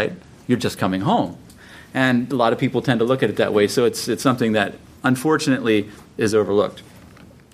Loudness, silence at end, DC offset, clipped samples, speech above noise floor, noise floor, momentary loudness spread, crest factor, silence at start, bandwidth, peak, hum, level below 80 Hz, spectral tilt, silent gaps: -20 LUFS; 0.3 s; under 0.1%; under 0.1%; 26 dB; -45 dBFS; 7 LU; 18 dB; 0 s; 15.5 kHz; -2 dBFS; none; -56 dBFS; -5.5 dB/octave; none